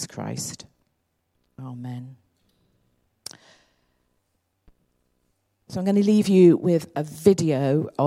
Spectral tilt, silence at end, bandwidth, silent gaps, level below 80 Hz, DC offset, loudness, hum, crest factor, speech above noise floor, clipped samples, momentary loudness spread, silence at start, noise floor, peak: -7 dB/octave; 0 s; 15 kHz; none; -64 dBFS; under 0.1%; -21 LUFS; none; 22 dB; 52 dB; under 0.1%; 25 LU; 0 s; -73 dBFS; -2 dBFS